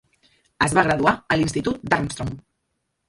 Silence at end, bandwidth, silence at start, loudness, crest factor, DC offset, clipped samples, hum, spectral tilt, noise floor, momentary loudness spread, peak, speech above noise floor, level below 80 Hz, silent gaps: 0.7 s; 11.5 kHz; 0.6 s; -21 LUFS; 22 dB; under 0.1%; under 0.1%; none; -5 dB/octave; -75 dBFS; 13 LU; -2 dBFS; 54 dB; -46 dBFS; none